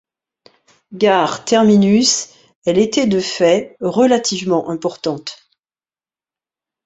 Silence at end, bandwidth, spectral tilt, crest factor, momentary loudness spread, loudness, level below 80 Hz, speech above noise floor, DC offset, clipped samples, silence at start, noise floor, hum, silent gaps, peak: 1.5 s; 8.2 kHz; -4.5 dB/octave; 16 dB; 12 LU; -15 LUFS; -58 dBFS; over 75 dB; under 0.1%; under 0.1%; 0.9 s; under -90 dBFS; none; 2.55-2.62 s; -2 dBFS